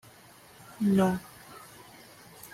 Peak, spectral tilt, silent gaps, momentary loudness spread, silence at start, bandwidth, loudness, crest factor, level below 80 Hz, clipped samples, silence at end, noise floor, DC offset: -14 dBFS; -7 dB/octave; none; 25 LU; 0.7 s; 16 kHz; -28 LUFS; 18 dB; -64 dBFS; under 0.1%; 0.05 s; -54 dBFS; under 0.1%